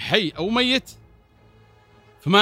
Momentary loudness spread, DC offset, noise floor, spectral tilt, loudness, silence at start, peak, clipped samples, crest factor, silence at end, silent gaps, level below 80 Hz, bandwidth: 5 LU; under 0.1%; -54 dBFS; -4.5 dB/octave; -21 LUFS; 0 s; 0 dBFS; under 0.1%; 24 dB; 0 s; none; -54 dBFS; 16 kHz